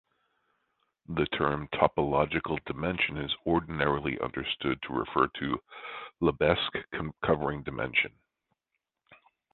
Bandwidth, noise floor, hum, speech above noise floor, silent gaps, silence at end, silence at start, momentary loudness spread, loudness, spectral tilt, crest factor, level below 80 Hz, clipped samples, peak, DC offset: 4.4 kHz; -85 dBFS; none; 55 dB; none; 0.4 s; 1.1 s; 8 LU; -30 LUFS; -9 dB/octave; 24 dB; -52 dBFS; under 0.1%; -6 dBFS; under 0.1%